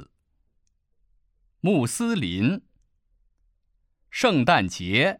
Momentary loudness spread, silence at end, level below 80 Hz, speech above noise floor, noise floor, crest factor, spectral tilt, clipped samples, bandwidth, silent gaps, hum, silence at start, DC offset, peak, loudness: 8 LU; 0.05 s; -58 dBFS; 47 dB; -69 dBFS; 20 dB; -5 dB/octave; under 0.1%; 16 kHz; none; none; 0 s; under 0.1%; -6 dBFS; -23 LUFS